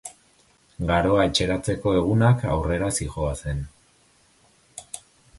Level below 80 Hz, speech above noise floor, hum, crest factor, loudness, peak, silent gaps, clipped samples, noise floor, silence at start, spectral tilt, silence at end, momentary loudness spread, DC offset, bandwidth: -38 dBFS; 38 dB; none; 18 dB; -23 LUFS; -6 dBFS; none; under 0.1%; -60 dBFS; 0.05 s; -5.5 dB/octave; 0.4 s; 20 LU; under 0.1%; 11.5 kHz